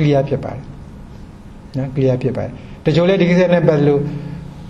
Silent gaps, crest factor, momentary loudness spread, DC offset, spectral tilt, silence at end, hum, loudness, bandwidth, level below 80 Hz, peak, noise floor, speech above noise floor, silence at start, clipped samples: none; 16 dB; 23 LU; under 0.1%; -8.5 dB/octave; 0 s; none; -16 LUFS; 7.4 kHz; -40 dBFS; -2 dBFS; -36 dBFS; 21 dB; 0 s; under 0.1%